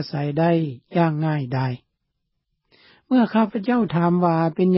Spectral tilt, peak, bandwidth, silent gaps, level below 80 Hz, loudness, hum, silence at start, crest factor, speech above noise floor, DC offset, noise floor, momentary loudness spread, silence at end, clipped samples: -12.5 dB/octave; -6 dBFS; 5.8 kHz; none; -62 dBFS; -21 LUFS; none; 0 s; 14 dB; 56 dB; under 0.1%; -76 dBFS; 6 LU; 0 s; under 0.1%